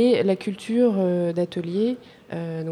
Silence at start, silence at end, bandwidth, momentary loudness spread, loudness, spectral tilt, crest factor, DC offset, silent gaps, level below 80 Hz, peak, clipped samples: 0 s; 0 s; 11 kHz; 12 LU; -23 LUFS; -7.5 dB/octave; 14 dB; under 0.1%; none; -68 dBFS; -10 dBFS; under 0.1%